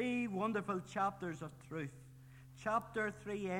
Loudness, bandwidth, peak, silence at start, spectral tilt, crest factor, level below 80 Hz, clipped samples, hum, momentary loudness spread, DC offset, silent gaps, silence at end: -40 LUFS; 16.5 kHz; -24 dBFS; 0 s; -6 dB/octave; 16 dB; -70 dBFS; under 0.1%; none; 20 LU; under 0.1%; none; 0 s